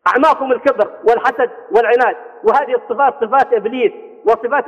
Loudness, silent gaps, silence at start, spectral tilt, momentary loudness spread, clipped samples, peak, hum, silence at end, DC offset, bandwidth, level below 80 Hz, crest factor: -15 LUFS; none; 0.05 s; -5 dB/octave; 6 LU; under 0.1%; -2 dBFS; none; 0 s; under 0.1%; 8.4 kHz; -58 dBFS; 14 dB